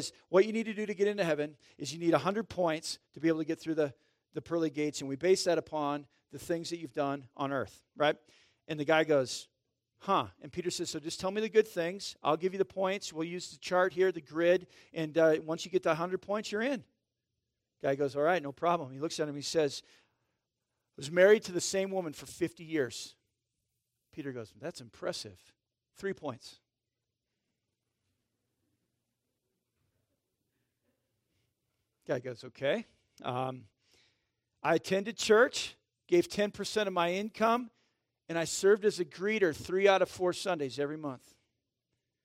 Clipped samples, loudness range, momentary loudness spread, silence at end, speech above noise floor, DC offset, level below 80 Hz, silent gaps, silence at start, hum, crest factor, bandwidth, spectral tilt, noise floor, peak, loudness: under 0.1%; 12 LU; 15 LU; 1.1 s; 56 dB; under 0.1%; -74 dBFS; none; 0 s; none; 22 dB; 16 kHz; -4.5 dB/octave; -88 dBFS; -12 dBFS; -32 LUFS